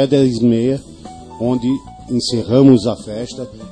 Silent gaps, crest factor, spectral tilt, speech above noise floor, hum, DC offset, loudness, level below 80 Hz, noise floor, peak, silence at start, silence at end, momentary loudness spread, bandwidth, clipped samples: none; 16 dB; -7 dB/octave; 20 dB; none; 0.2%; -16 LUFS; -44 dBFS; -34 dBFS; 0 dBFS; 0 s; 0 s; 18 LU; 10 kHz; under 0.1%